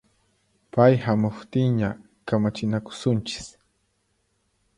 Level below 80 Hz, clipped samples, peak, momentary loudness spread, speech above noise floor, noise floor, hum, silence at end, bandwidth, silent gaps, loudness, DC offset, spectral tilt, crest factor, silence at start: -56 dBFS; under 0.1%; -4 dBFS; 15 LU; 48 dB; -71 dBFS; none; 1.3 s; 10.5 kHz; none; -24 LUFS; under 0.1%; -7 dB/octave; 22 dB; 0.75 s